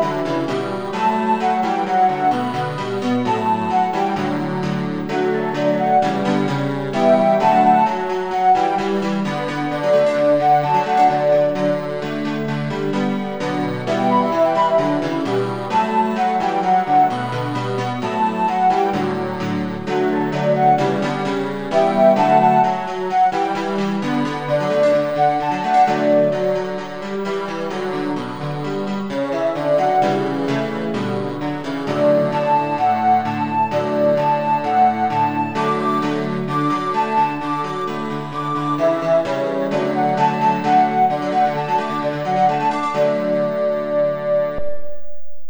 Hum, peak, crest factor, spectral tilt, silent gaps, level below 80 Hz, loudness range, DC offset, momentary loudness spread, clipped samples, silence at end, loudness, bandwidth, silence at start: none; -2 dBFS; 16 dB; -6.5 dB/octave; none; -54 dBFS; 4 LU; 0.6%; 8 LU; under 0.1%; 0 s; -18 LUFS; over 20 kHz; 0 s